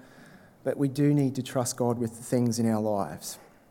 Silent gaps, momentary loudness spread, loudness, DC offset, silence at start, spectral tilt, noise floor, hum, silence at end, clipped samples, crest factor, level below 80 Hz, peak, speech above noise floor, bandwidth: none; 12 LU; -28 LUFS; under 0.1%; 0.15 s; -6 dB/octave; -53 dBFS; none; 0.35 s; under 0.1%; 16 dB; -68 dBFS; -12 dBFS; 26 dB; 17 kHz